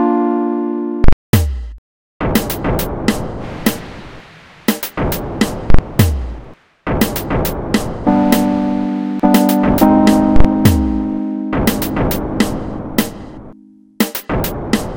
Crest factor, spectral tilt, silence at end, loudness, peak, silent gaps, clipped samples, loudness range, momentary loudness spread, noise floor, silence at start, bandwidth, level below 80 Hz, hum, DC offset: 14 dB; -6 dB/octave; 0 s; -16 LUFS; 0 dBFS; 1.13-1.33 s, 1.78-2.20 s; 0.3%; 7 LU; 12 LU; -42 dBFS; 0 s; 17.5 kHz; -24 dBFS; none; under 0.1%